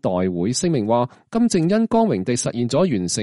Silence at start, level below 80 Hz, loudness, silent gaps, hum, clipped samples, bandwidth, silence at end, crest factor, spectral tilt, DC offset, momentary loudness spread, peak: 0.05 s; -54 dBFS; -20 LUFS; none; none; under 0.1%; 11.5 kHz; 0 s; 14 dB; -5.5 dB/octave; under 0.1%; 4 LU; -6 dBFS